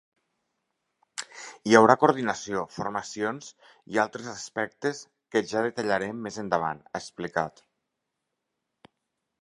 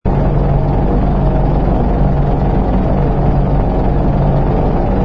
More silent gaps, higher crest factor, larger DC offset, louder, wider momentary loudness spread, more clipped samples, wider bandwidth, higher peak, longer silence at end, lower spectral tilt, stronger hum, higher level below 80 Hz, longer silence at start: neither; first, 26 dB vs 12 dB; neither; second, -27 LUFS vs -14 LUFS; first, 18 LU vs 1 LU; neither; first, 11.5 kHz vs 5.2 kHz; about the same, -2 dBFS vs 0 dBFS; first, 1.9 s vs 0 s; second, -4.5 dB/octave vs -11 dB/octave; neither; second, -68 dBFS vs -16 dBFS; first, 1.2 s vs 0.05 s